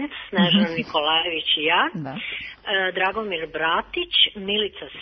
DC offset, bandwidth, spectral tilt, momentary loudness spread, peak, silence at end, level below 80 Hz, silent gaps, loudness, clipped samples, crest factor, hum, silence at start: under 0.1%; 6.2 kHz; -6.5 dB/octave; 11 LU; -6 dBFS; 0 s; -56 dBFS; none; -21 LUFS; under 0.1%; 18 dB; none; 0 s